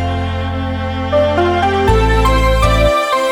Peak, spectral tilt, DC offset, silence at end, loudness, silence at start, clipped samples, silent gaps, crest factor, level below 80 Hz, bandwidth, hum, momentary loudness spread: 0 dBFS; -6 dB/octave; 0.2%; 0 s; -14 LUFS; 0 s; under 0.1%; none; 12 dB; -20 dBFS; 15 kHz; none; 7 LU